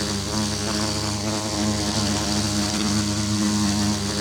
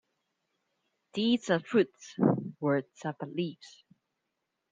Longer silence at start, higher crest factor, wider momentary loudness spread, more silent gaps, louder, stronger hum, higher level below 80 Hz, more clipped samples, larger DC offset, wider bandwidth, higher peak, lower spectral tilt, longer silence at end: second, 0 s vs 1.15 s; second, 14 dB vs 22 dB; second, 3 LU vs 11 LU; neither; first, -22 LUFS vs -31 LUFS; neither; first, -40 dBFS vs -74 dBFS; neither; neither; first, 18.5 kHz vs 7.8 kHz; first, -8 dBFS vs -12 dBFS; second, -3.5 dB/octave vs -6.5 dB/octave; second, 0 s vs 1.05 s